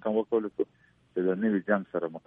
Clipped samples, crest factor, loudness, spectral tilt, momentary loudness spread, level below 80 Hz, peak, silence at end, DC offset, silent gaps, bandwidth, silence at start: under 0.1%; 20 dB; -30 LUFS; -10.5 dB/octave; 8 LU; -74 dBFS; -10 dBFS; 0.1 s; under 0.1%; none; 3.7 kHz; 0.05 s